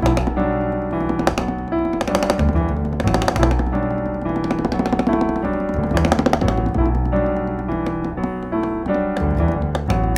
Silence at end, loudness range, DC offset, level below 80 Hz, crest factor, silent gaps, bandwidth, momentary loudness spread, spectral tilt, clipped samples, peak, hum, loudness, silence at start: 0 s; 2 LU; under 0.1%; -26 dBFS; 18 dB; none; 14 kHz; 5 LU; -7 dB/octave; under 0.1%; 0 dBFS; none; -20 LUFS; 0 s